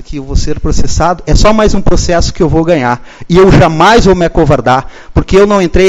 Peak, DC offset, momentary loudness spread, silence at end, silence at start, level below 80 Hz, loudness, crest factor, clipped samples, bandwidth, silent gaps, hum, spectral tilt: 0 dBFS; under 0.1%; 10 LU; 0 s; 0 s; -16 dBFS; -9 LUFS; 8 dB; 3%; 8.6 kHz; none; none; -5.5 dB/octave